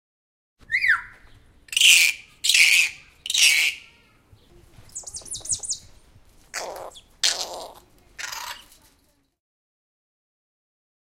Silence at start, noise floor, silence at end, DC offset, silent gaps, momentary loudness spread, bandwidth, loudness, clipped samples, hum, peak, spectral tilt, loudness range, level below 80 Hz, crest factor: 0.7 s; -64 dBFS; 2.45 s; under 0.1%; none; 22 LU; 17 kHz; -18 LUFS; under 0.1%; none; 0 dBFS; 3 dB/octave; 15 LU; -58 dBFS; 24 dB